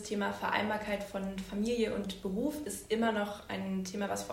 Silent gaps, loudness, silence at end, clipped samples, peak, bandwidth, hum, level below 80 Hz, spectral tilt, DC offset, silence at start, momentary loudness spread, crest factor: none; -35 LUFS; 0 s; under 0.1%; -16 dBFS; 16 kHz; none; -58 dBFS; -4.5 dB/octave; under 0.1%; 0 s; 7 LU; 18 dB